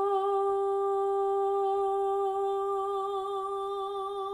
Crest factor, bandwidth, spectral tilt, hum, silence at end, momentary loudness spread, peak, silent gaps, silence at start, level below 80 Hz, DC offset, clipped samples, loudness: 10 dB; 10 kHz; -5 dB/octave; none; 0 s; 5 LU; -18 dBFS; none; 0 s; -68 dBFS; under 0.1%; under 0.1%; -30 LUFS